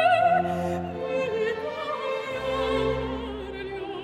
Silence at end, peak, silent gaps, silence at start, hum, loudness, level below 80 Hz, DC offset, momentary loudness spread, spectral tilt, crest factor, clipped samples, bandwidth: 0 s; -10 dBFS; none; 0 s; none; -27 LUFS; -46 dBFS; under 0.1%; 12 LU; -6 dB/octave; 16 dB; under 0.1%; 12.5 kHz